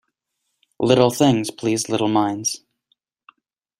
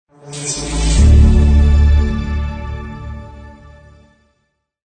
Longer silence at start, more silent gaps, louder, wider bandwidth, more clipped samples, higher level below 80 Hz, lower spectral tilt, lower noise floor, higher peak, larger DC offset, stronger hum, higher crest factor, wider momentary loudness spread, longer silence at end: first, 0.8 s vs 0.25 s; neither; second, -19 LUFS vs -14 LUFS; first, 16 kHz vs 9.4 kHz; neither; second, -60 dBFS vs -16 dBFS; about the same, -5 dB/octave vs -6 dB/octave; first, -76 dBFS vs -67 dBFS; about the same, -2 dBFS vs 0 dBFS; neither; neither; first, 20 dB vs 14 dB; second, 9 LU vs 21 LU; second, 1.25 s vs 1.4 s